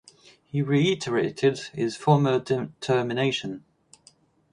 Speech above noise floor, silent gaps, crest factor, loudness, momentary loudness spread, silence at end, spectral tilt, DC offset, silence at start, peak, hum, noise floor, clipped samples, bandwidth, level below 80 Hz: 35 dB; none; 20 dB; -25 LUFS; 9 LU; 0.95 s; -6 dB/octave; under 0.1%; 0.55 s; -6 dBFS; none; -59 dBFS; under 0.1%; 11 kHz; -64 dBFS